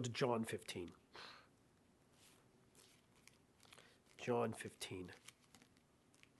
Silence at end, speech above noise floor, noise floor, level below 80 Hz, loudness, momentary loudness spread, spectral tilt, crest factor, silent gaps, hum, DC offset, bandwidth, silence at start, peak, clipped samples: 0.8 s; 29 dB; -73 dBFS; -78 dBFS; -45 LUFS; 27 LU; -5 dB/octave; 24 dB; none; none; under 0.1%; 12 kHz; 0 s; -24 dBFS; under 0.1%